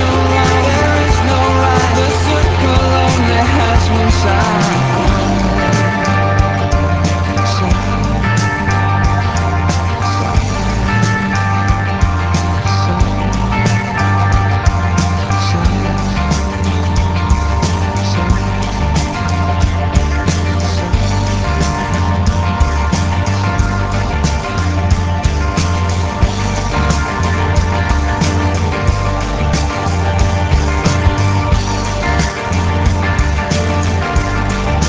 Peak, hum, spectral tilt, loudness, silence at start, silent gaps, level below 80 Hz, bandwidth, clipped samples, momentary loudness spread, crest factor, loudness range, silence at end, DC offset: 0 dBFS; none; -5.5 dB/octave; -14 LUFS; 0 s; none; -18 dBFS; 8 kHz; under 0.1%; 4 LU; 12 dB; 3 LU; 0 s; under 0.1%